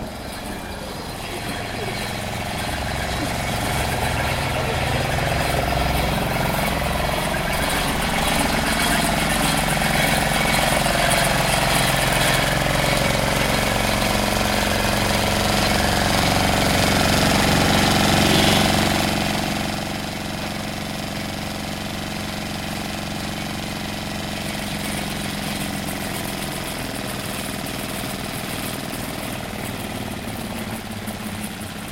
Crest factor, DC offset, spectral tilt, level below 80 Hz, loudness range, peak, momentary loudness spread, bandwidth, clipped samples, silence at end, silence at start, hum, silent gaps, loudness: 18 dB; under 0.1%; -3.5 dB/octave; -34 dBFS; 10 LU; -4 dBFS; 11 LU; 17 kHz; under 0.1%; 0 s; 0 s; none; none; -21 LUFS